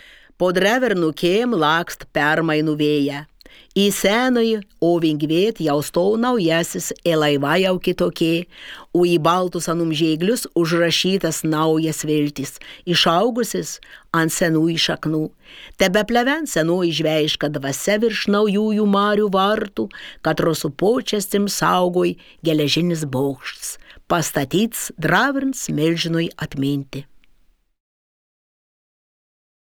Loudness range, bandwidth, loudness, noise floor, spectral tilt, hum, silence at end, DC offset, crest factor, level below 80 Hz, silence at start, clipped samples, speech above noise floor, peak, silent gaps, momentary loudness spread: 2 LU; over 20 kHz; -19 LUFS; -56 dBFS; -4.5 dB/octave; none; 2.65 s; under 0.1%; 18 dB; -50 dBFS; 0.4 s; under 0.1%; 37 dB; 0 dBFS; none; 8 LU